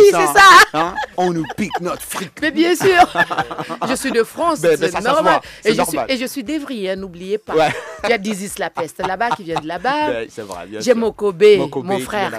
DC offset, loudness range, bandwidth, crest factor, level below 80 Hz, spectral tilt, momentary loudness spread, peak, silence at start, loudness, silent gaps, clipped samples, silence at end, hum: under 0.1%; 7 LU; 16 kHz; 16 dB; -48 dBFS; -3.5 dB/octave; 12 LU; 0 dBFS; 0 s; -16 LUFS; none; under 0.1%; 0 s; none